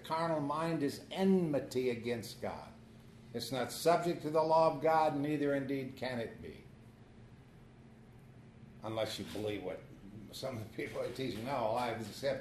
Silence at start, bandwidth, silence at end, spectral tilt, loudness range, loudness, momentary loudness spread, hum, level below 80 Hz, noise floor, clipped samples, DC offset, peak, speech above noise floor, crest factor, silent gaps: 0 s; 13.5 kHz; 0 s; -6 dB/octave; 12 LU; -35 LUFS; 18 LU; none; -66 dBFS; -57 dBFS; under 0.1%; under 0.1%; -16 dBFS; 22 dB; 20 dB; none